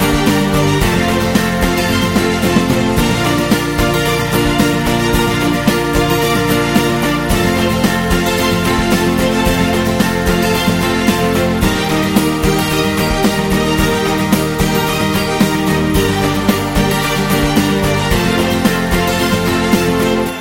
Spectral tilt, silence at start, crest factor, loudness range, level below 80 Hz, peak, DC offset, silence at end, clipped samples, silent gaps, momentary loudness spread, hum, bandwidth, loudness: -5 dB/octave; 0 s; 14 dB; 0 LU; -26 dBFS; 0 dBFS; under 0.1%; 0 s; under 0.1%; none; 1 LU; none; 17 kHz; -14 LUFS